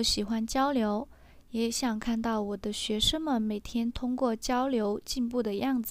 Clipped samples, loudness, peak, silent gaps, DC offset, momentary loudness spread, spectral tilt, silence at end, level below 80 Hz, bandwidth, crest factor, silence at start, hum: under 0.1%; -30 LUFS; -14 dBFS; none; under 0.1%; 6 LU; -3.5 dB/octave; 0 s; -48 dBFS; 16 kHz; 16 dB; 0 s; none